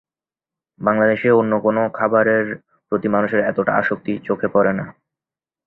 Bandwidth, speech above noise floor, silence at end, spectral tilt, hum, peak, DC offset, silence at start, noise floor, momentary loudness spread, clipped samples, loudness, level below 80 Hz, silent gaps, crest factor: 4.2 kHz; over 72 dB; 0.75 s; -10 dB/octave; none; -2 dBFS; under 0.1%; 0.8 s; under -90 dBFS; 9 LU; under 0.1%; -18 LUFS; -58 dBFS; none; 18 dB